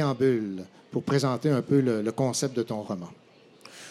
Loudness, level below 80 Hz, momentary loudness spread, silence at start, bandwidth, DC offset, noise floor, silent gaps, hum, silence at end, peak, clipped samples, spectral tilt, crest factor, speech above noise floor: -27 LUFS; -72 dBFS; 16 LU; 0 s; 13.5 kHz; under 0.1%; -52 dBFS; none; none; 0 s; -12 dBFS; under 0.1%; -6 dB/octave; 16 dB; 26 dB